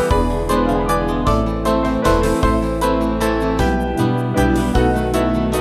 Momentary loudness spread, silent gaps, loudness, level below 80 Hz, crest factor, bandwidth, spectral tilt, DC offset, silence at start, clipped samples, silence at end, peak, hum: 2 LU; none; -17 LUFS; -24 dBFS; 14 dB; 14 kHz; -6.5 dB/octave; under 0.1%; 0 s; under 0.1%; 0 s; -2 dBFS; none